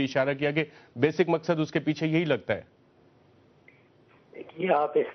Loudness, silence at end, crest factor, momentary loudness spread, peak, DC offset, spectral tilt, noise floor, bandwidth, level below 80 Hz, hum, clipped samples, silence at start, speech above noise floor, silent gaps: -27 LUFS; 0 s; 20 dB; 9 LU; -8 dBFS; under 0.1%; -5 dB/octave; -60 dBFS; 6.4 kHz; -68 dBFS; none; under 0.1%; 0 s; 33 dB; none